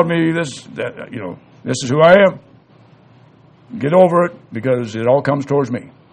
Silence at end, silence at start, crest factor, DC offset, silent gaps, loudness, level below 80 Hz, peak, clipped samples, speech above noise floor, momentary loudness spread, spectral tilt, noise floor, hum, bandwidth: 0.25 s; 0 s; 16 dB; under 0.1%; none; -15 LUFS; -58 dBFS; 0 dBFS; under 0.1%; 32 dB; 18 LU; -6 dB/octave; -47 dBFS; none; 9.6 kHz